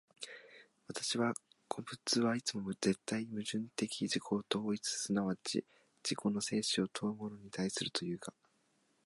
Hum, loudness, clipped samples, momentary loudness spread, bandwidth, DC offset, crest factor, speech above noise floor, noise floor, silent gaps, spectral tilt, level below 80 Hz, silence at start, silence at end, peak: none; -37 LUFS; under 0.1%; 11 LU; 11.5 kHz; under 0.1%; 22 dB; 38 dB; -76 dBFS; none; -4 dB/octave; -76 dBFS; 0.2 s; 0.75 s; -16 dBFS